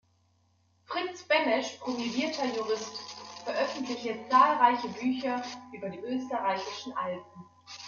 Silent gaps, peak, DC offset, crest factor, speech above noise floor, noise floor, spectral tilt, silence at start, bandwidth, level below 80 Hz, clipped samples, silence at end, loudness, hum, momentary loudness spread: none; -10 dBFS; under 0.1%; 22 dB; 39 dB; -69 dBFS; -3.5 dB/octave; 0.9 s; 7.4 kHz; -78 dBFS; under 0.1%; 0 s; -30 LUFS; none; 16 LU